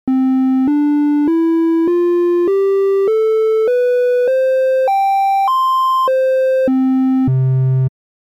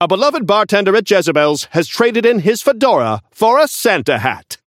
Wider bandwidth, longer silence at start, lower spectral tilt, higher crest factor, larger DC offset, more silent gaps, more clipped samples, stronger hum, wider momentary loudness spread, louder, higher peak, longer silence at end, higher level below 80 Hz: about the same, 15.5 kHz vs 16.5 kHz; about the same, 0.05 s vs 0 s; first, -9 dB/octave vs -4 dB/octave; second, 8 dB vs 14 dB; neither; neither; neither; neither; second, 1 LU vs 5 LU; about the same, -14 LUFS vs -13 LUFS; second, -6 dBFS vs 0 dBFS; first, 0.3 s vs 0.1 s; first, -54 dBFS vs -60 dBFS